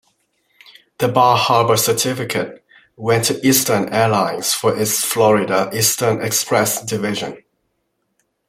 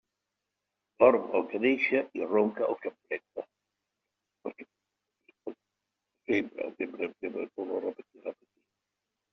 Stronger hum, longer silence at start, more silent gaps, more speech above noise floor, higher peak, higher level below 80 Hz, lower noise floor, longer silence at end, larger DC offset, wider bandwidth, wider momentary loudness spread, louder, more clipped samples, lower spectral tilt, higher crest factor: second, none vs 50 Hz at -75 dBFS; about the same, 1 s vs 1 s; neither; second, 53 dB vs 57 dB; first, -2 dBFS vs -8 dBFS; first, -58 dBFS vs -74 dBFS; second, -70 dBFS vs -86 dBFS; about the same, 1.1 s vs 1 s; neither; first, 16.5 kHz vs 6.2 kHz; second, 8 LU vs 21 LU; first, -16 LUFS vs -30 LUFS; neither; about the same, -3.5 dB/octave vs -3.5 dB/octave; second, 16 dB vs 24 dB